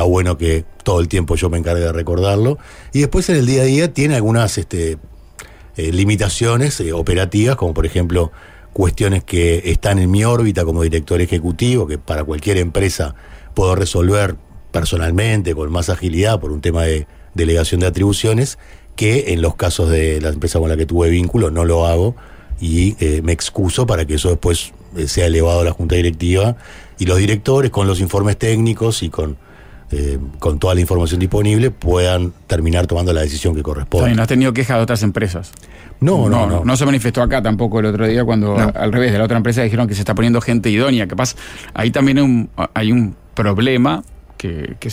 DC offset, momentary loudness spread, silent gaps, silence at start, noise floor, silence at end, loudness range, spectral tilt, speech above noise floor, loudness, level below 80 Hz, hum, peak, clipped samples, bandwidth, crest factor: under 0.1%; 8 LU; none; 0 s; -38 dBFS; 0 s; 2 LU; -6 dB/octave; 23 dB; -16 LUFS; -26 dBFS; none; -4 dBFS; under 0.1%; 16 kHz; 12 dB